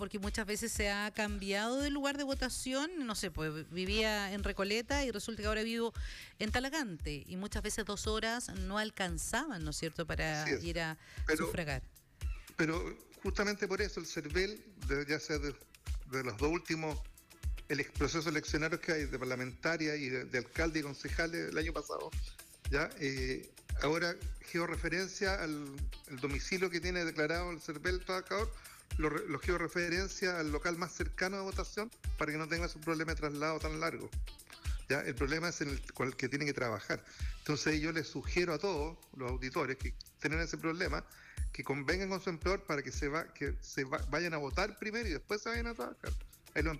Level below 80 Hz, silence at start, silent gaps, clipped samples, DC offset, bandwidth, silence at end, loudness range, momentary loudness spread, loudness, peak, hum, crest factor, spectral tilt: -46 dBFS; 0 s; none; under 0.1%; under 0.1%; 15.5 kHz; 0 s; 2 LU; 8 LU; -37 LUFS; -24 dBFS; none; 14 dB; -4.5 dB/octave